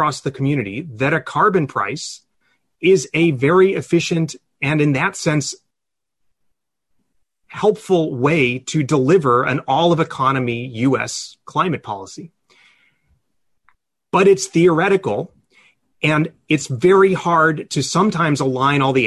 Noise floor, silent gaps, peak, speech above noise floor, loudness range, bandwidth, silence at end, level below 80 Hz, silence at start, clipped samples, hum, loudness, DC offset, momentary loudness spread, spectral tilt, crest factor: -84 dBFS; none; -4 dBFS; 67 dB; 6 LU; 12 kHz; 0 s; -56 dBFS; 0 s; under 0.1%; none; -17 LUFS; under 0.1%; 12 LU; -5.5 dB/octave; 14 dB